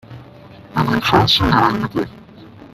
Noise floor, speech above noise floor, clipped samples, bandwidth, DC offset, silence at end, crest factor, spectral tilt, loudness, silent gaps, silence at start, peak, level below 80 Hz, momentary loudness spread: -40 dBFS; 25 dB; under 0.1%; 15 kHz; under 0.1%; 0.1 s; 18 dB; -5.5 dB/octave; -16 LUFS; none; 0.1 s; 0 dBFS; -38 dBFS; 12 LU